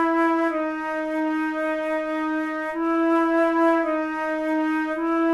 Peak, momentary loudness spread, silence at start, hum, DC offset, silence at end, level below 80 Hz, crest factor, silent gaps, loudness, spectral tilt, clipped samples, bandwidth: -10 dBFS; 6 LU; 0 s; none; under 0.1%; 0 s; -60 dBFS; 12 dB; none; -23 LUFS; -4.5 dB/octave; under 0.1%; 11 kHz